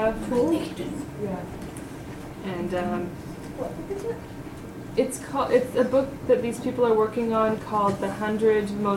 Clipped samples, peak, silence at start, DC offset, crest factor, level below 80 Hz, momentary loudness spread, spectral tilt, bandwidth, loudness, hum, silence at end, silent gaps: under 0.1%; -8 dBFS; 0 s; under 0.1%; 18 dB; -48 dBFS; 15 LU; -6 dB/octave; 16.5 kHz; -26 LUFS; none; 0 s; none